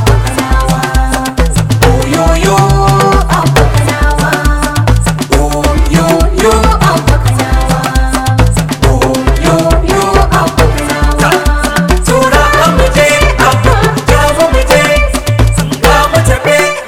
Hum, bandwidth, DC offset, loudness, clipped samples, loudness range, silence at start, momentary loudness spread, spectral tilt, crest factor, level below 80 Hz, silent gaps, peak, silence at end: none; 17 kHz; under 0.1%; -9 LUFS; 0.8%; 2 LU; 0 s; 4 LU; -5 dB/octave; 8 dB; -14 dBFS; none; 0 dBFS; 0 s